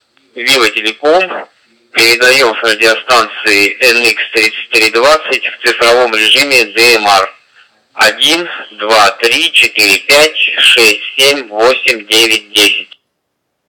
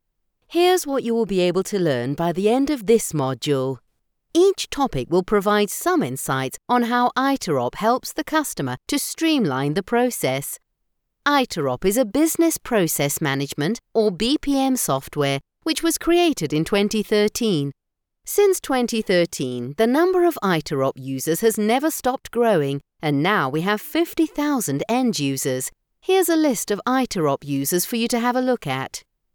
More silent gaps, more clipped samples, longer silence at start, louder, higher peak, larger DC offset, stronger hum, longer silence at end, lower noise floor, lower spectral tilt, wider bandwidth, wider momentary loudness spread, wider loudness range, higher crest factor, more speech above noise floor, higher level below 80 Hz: neither; neither; second, 0.35 s vs 0.5 s; first, -8 LUFS vs -21 LUFS; first, 0 dBFS vs -6 dBFS; neither; neither; first, 0.85 s vs 0.35 s; second, -68 dBFS vs -74 dBFS; second, -0.5 dB/octave vs -4.5 dB/octave; about the same, over 20 kHz vs over 20 kHz; about the same, 6 LU vs 6 LU; about the same, 2 LU vs 1 LU; second, 10 dB vs 16 dB; first, 59 dB vs 53 dB; about the same, -52 dBFS vs -50 dBFS